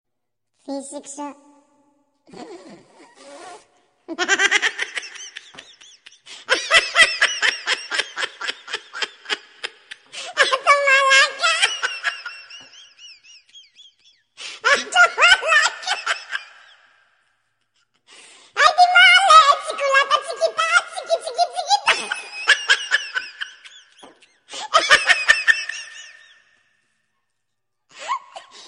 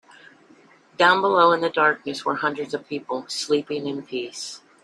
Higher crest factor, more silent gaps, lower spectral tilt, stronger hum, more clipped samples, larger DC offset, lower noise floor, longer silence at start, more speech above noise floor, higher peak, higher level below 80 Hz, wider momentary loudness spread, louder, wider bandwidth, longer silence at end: about the same, 20 dB vs 20 dB; neither; second, 1.5 dB/octave vs -3.5 dB/octave; neither; neither; neither; first, -81 dBFS vs -53 dBFS; second, 0.7 s vs 1 s; first, 57 dB vs 31 dB; first, 0 dBFS vs -4 dBFS; first, -62 dBFS vs -72 dBFS; first, 21 LU vs 13 LU; first, -16 LUFS vs -22 LUFS; second, 10.5 kHz vs 12.5 kHz; second, 0.05 s vs 0.25 s